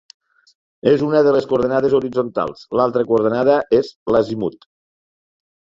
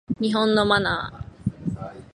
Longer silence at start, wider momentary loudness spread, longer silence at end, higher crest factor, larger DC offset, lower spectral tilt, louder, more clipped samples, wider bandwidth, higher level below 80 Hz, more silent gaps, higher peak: first, 0.85 s vs 0.1 s; second, 8 LU vs 14 LU; first, 1.3 s vs 0.1 s; about the same, 16 dB vs 20 dB; neither; first, -7.5 dB/octave vs -6 dB/octave; first, -17 LUFS vs -23 LUFS; neither; second, 7.4 kHz vs 11 kHz; second, -54 dBFS vs -46 dBFS; first, 3.96-4.06 s vs none; about the same, -2 dBFS vs -4 dBFS